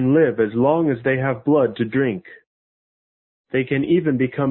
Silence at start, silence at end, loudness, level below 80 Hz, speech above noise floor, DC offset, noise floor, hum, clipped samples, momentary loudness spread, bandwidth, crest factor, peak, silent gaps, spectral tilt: 0 s; 0 s; -19 LUFS; -58 dBFS; over 71 dB; under 0.1%; under -90 dBFS; none; under 0.1%; 6 LU; 4.2 kHz; 16 dB; -4 dBFS; 2.47-3.44 s; -12.5 dB/octave